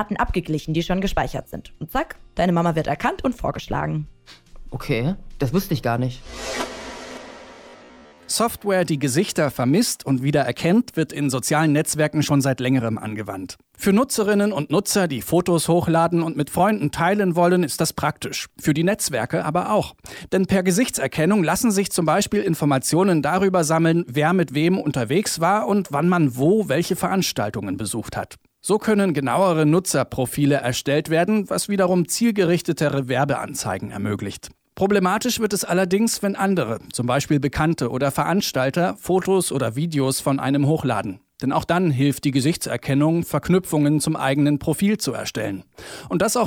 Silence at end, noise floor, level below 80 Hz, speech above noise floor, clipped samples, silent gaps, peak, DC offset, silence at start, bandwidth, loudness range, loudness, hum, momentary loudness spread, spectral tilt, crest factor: 0 s; -46 dBFS; -44 dBFS; 26 dB; under 0.1%; none; -6 dBFS; under 0.1%; 0 s; 18 kHz; 5 LU; -21 LUFS; none; 9 LU; -5 dB/octave; 14 dB